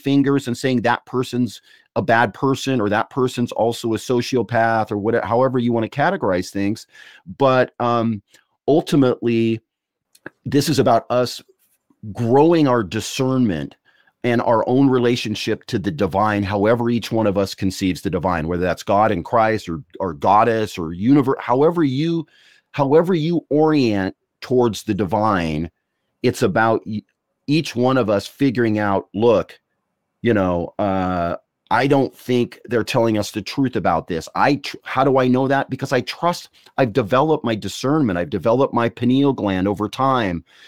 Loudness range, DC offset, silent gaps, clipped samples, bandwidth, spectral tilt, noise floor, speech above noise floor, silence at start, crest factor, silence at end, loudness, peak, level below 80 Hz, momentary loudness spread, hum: 2 LU; 0.2%; none; under 0.1%; 16.5 kHz; -6.5 dB/octave; -74 dBFS; 55 dB; 0.05 s; 18 dB; 0.25 s; -19 LUFS; -2 dBFS; -50 dBFS; 9 LU; none